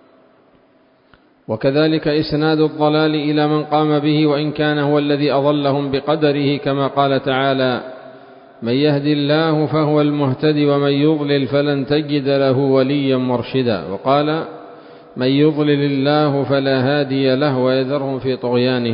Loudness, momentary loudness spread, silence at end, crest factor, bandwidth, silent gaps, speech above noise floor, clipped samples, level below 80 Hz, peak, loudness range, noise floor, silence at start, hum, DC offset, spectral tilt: -16 LUFS; 5 LU; 0 s; 16 dB; 5.4 kHz; none; 38 dB; under 0.1%; -54 dBFS; 0 dBFS; 2 LU; -53 dBFS; 1.5 s; none; under 0.1%; -12 dB/octave